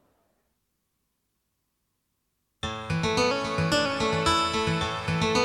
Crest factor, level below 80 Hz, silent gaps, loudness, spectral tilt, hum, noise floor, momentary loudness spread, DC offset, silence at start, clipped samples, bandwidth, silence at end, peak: 18 dB; -48 dBFS; none; -26 LUFS; -4.5 dB/octave; none; -77 dBFS; 8 LU; under 0.1%; 2.65 s; under 0.1%; 13.5 kHz; 0 s; -10 dBFS